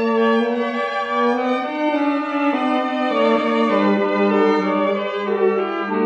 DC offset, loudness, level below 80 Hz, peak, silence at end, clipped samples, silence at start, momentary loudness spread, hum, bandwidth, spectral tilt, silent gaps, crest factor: under 0.1%; -19 LUFS; -72 dBFS; -4 dBFS; 0 s; under 0.1%; 0 s; 5 LU; none; 8.4 kHz; -6.5 dB/octave; none; 14 dB